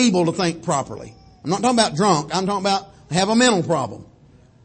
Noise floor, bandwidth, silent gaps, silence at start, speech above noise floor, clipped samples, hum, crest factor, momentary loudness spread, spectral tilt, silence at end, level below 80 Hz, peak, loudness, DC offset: -50 dBFS; 8.8 kHz; none; 0 s; 31 dB; under 0.1%; none; 18 dB; 15 LU; -4.5 dB/octave; 0.6 s; -54 dBFS; -2 dBFS; -19 LUFS; under 0.1%